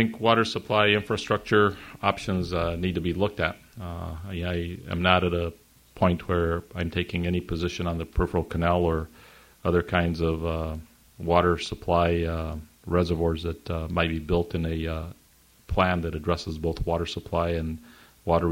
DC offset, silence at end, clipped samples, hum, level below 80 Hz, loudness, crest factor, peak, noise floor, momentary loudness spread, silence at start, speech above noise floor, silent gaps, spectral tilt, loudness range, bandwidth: under 0.1%; 0 s; under 0.1%; none; -40 dBFS; -26 LUFS; 24 dB; -2 dBFS; -58 dBFS; 12 LU; 0 s; 33 dB; none; -6.5 dB/octave; 3 LU; 16 kHz